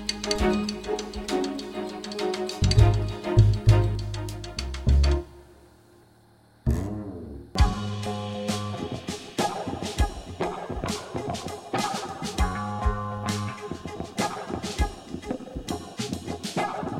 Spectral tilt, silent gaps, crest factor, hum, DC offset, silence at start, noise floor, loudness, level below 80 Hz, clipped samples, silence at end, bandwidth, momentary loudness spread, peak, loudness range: -5.5 dB/octave; none; 22 dB; none; under 0.1%; 0 s; -57 dBFS; -28 LUFS; -32 dBFS; under 0.1%; 0 s; 14.5 kHz; 13 LU; -4 dBFS; 7 LU